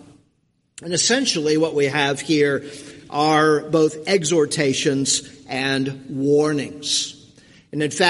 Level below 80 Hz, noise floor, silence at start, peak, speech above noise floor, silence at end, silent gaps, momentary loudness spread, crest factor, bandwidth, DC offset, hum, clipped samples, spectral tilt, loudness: -62 dBFS; -66 dBFS; 0.8 s; 0 dBFS; 46 dB; 0 s; none; 10 LU; 20 dB; 11.5 kHz; under 0.1%; none; under 0.1%; -3.5 dB/octave; -20 LUFS